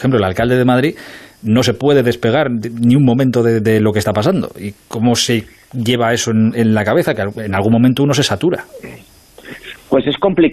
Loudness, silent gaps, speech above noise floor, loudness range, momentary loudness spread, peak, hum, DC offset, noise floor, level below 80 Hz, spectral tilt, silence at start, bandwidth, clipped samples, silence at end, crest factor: -14 LUFS; none; 22 dB; 2 LU; 16 LU; -2 dBFS; none; under 0.1%; -36 dBFS; -46 dBFS; -5.5 dB/octave; 0 s; 14 kHz; under 0.1%; 0 s; 12 dB